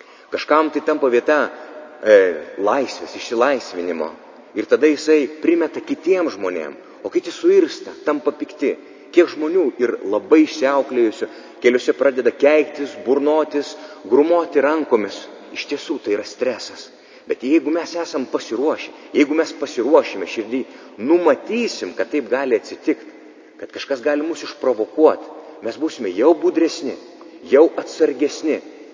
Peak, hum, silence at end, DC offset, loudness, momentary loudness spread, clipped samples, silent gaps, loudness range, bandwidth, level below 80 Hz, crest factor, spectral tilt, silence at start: 0 dBFS; none; 0.05 s; under 0.1%; -19 LUFS; 13 LU; under 0.1%; none; 4 LU; 7.6 kHz; -72 dBFS; 18 dB; -4 dB/octave; 0.3 s